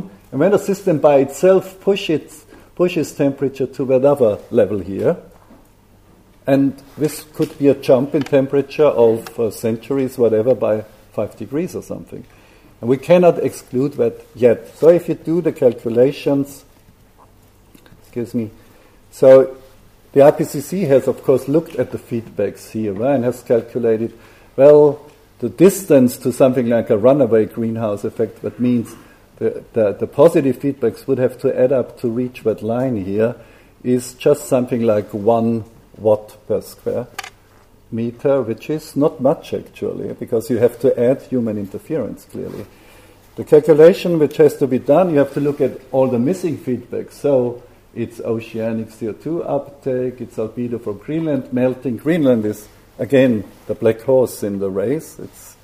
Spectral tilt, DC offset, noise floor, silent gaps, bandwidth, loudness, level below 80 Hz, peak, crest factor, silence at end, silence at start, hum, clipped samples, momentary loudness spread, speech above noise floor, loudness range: -7 dB/octave; under 0.1%; -49 dBFS; none; 15.5 kHz; -17 LUFS; -52 dBFS; 0 dBFS; 16 dB; 0.15 s; 0 s; none; under 0.1%; 13 LU; 33 dB; 7 LU